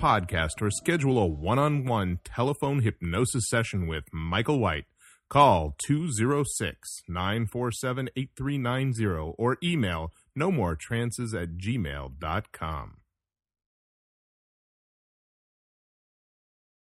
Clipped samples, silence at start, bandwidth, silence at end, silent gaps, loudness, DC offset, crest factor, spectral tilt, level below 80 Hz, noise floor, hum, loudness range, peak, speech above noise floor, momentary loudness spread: under 0.1%; 0 s; 14.5 kHz; 4 s; none; -28 LUFS; under 0.1%; 22 dB; -5.5 dB/octave; -46 dBFS; -87 dBFS; none; 10 LU; -6 dBFS; 60 dB; 9 LU